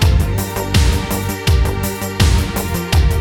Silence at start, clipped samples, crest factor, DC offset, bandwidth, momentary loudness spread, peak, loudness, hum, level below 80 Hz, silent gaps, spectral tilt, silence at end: 0 s; under 0.1%; 14 dB; under 0.1%; 19.5 kHz; 5 LU; -2 dBFS; -17 LUFS; none; -18 dBFS; none; -5 dB/octave; 0 s